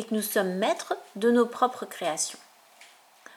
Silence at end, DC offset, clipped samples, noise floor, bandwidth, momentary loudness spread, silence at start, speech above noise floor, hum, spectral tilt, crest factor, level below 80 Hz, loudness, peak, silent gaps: 0.5 s; under 0.1%; under 0.1%; -55 dBFS; 19.5 kHz; 9 LU; 0 s; 28 dB; none; -3.5 dB/octave; 18 dB; -88 dBFS; -27 LUFS; -10 dBFS; none